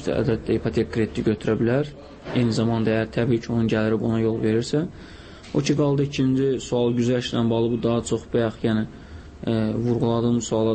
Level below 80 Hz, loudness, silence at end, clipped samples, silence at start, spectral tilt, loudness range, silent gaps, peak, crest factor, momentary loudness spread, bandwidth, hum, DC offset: -46 dBFS; -23 LUFS; 0 s; under 0.1%; 0 s; -6.5 dB/octave; 1 LU; none; -10 dBFS; 12 dB; 7 LU; 8.8 kHz; none; under 0.1%